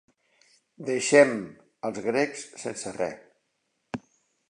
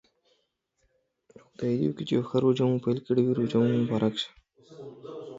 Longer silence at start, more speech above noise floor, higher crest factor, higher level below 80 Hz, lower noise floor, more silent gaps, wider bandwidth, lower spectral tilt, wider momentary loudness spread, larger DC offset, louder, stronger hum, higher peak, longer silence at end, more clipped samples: second, 0.8 s vs 1.6 s; about the same, 51 dB vs 49 dB; first, 24 dB vs 18 dB; about the same, -70 dBFS vs -66 dBFS; about the same, -76 dBFS vs -75 dBFS; neither; first, 11 kHz vs 7.8 kHz; second, -4 dB/octave vs -8 dB/octave; about the same, 20 LU vs 18 LU; neither; about the same, -26 LUFS vs -27 LUFS; neither; first, -4 dBFS vs -12 dBFS; first, 0.5 s vs 0 s; neither